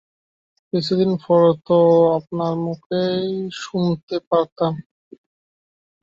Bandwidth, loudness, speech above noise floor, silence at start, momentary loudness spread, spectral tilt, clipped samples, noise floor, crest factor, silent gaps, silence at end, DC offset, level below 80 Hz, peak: 7.6 kHz; -19 LUFS; over 72 dB; 0.75 s; 11 LU; -7.5 dB/octave; under 0.1%; under -90 dBFS; 16 dB; 2.86-2.90 s, 4.03-4.07 s, 4.27-4.31 s, 4.52-4.56 s; 1.2 s; under 0.1%; -62 dBFS; -4 dBFS